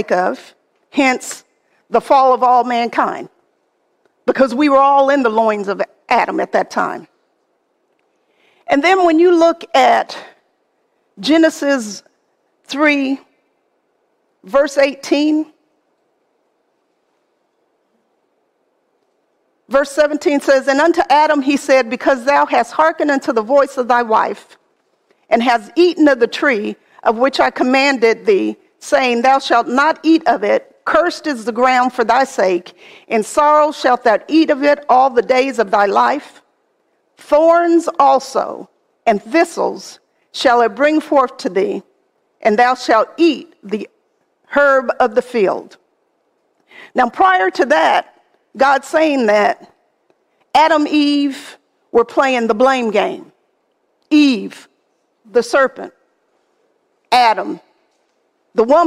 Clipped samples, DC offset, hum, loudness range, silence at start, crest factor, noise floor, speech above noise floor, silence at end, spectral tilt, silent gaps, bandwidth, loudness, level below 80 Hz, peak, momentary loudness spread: under 0.1%; under 0.1%; none; 5 LU; 0 s; 14 dB; -64 dBFS; 50 dB; 0 s; -4 dB/octave; none; 14.5 kHz; -14 LUFS; -58 dBFS; 0 dBFS; 11 LU